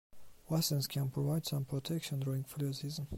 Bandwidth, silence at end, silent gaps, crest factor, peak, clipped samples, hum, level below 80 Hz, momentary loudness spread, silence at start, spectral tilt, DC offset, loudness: 16 kHz; 0 s; none; 14 dB; -22 dBFS; under 0.1%; none; -62 dBFS; 5 LU; 0.15 s; -5.5 dB/octave; under 0.1%; -36 LUFS